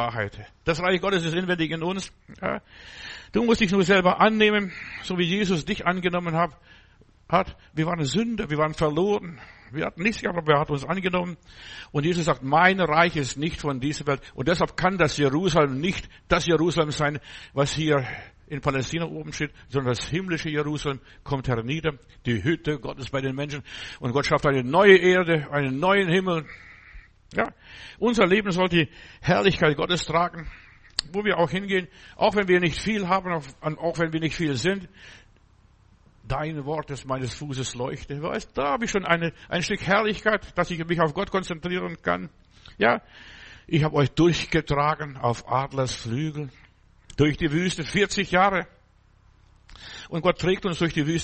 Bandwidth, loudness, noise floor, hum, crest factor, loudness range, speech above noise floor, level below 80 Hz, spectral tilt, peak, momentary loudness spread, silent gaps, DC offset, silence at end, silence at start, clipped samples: 8.4 kHz; -24 LUFS; -58 dBFS; none; 24 dB; 7 LU; 34 dB; -46 dBFS; -5.5 dB/octave; -2 dBFS; 12 LU; none; under 0.1%; 0 s; 0 s; under 0.1%